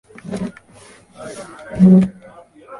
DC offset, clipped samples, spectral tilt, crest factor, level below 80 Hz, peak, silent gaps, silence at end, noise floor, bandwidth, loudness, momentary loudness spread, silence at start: under 0.1%; under 0.1%; -9 dB/octave; 16 dB; -48 dBFS; -2 dBFS; none; 0.05 s; -45 dBFS; 11 kHz; -14 LUFS; 23 LU; 0.25 s